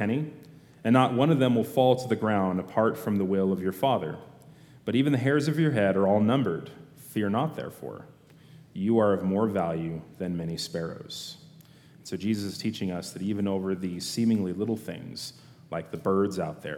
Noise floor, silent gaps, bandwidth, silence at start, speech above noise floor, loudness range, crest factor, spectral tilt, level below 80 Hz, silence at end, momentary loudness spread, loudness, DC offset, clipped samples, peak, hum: -53 dBFS; none; 17 kHz; 0 s; 26 dB; 7 LU; 20 dB; -6.5 dB/octave; -66 dBFS; 0 s; 15 LU; -27 LUFS; under 0.1%; under 0.1%; -6 dBFS; none